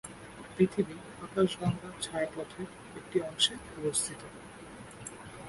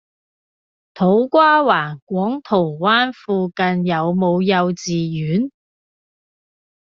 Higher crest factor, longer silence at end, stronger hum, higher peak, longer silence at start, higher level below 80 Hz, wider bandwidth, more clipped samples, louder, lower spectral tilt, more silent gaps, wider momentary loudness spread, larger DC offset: first, 22 dB vs 16 dB; second, 0 s vs 1.3 s; neither; second, -12 dBFS vs -2 dBFS; second, 0.05 s vs 0.95 s; about the same, -60 dBFS vs -60 dBFS; first, 11.5 kHz vs 7.2 kHz; neither; second, -32 LUFS vs -17 LUFS; about the same, -4 dB/octave vs -4.5 dB/octave; second, none vs 2.02-2.07 s; first, 19 LU vs 9 LU; neither